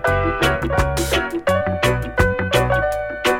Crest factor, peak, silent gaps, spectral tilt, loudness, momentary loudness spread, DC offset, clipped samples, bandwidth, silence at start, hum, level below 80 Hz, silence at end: 18 dB; 0 dBFS; none; -5 dB/octave; -19 LUFS; 3 LU; under 0.1%; under 0.1%; 18 kHz; 0 s; none; -30 dBFS; 0 s